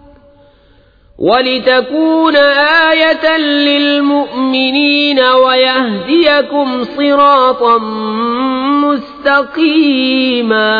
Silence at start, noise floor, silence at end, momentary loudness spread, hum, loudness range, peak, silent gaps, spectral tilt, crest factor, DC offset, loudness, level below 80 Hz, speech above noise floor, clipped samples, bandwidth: 1.2 s; -46 dBFS; 0 s; 6 LU; none; 2 LU; 0 dBFS; none; -6 dB/octave; 10 dB; under 0.1%; -10 LUFS; -50 dBFS; 36 dB; under 0.1%; 5 kHz